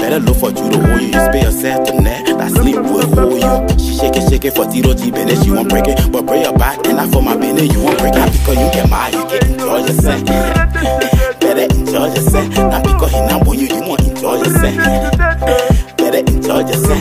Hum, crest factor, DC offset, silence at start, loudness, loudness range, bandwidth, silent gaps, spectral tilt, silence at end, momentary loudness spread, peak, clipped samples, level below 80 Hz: none; 12 dB; under 0.1%; 0 s; -12 LUFS; 1 LU; 16 kHz; none; -5.5 dB/octave; 0 s; 3 LU; 0 dBFS; under 0.1%; -18 dBFS